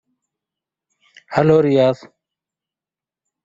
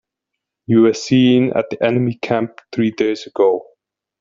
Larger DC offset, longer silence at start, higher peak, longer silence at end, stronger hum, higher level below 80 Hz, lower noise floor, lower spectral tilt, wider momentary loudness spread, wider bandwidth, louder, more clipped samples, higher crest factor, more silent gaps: neither; first, 1.3 s vs 0.7 s; about the same, -2 dBFS vs -2 dBFS; first, 1.5 s vs 0.6 s; neither; about the same, -56 dBFS vs -60 dBFS; first, -90 dBFS vs -80 dBFS; first, -8 dB/octave vs -6.5 dB/octave; first, 10 LU vs 7 LU; about the same, 7.6 kHz vs 7.6 kHz; about the same, -16 LUFS vs -17 LUFS; neither; about the same, 18 dB vs 14 dB; neither